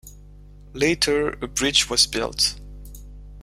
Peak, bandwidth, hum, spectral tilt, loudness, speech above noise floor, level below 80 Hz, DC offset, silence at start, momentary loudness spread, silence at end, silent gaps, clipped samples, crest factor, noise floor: -2 dBFS; 16 kHz; 50 Hz at -40 dBFS; -2 dB/octave; -20 LUFS; 22 dB; -42 dBFS; under 0.1%; 0.05 s; 22 LU; 0 s; none; under 0.1%; 22 dB; -44 dBFS